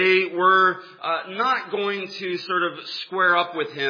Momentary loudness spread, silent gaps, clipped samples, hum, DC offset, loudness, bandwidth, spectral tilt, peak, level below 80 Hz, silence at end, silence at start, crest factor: 11 LU; none; under 0.1%; none; under 0.1%; -22 LUFS; 5.2 kHz; -5 dB/octave; -6 dBFS; under -90 dBFS; 0 s; 0 s; 16 dB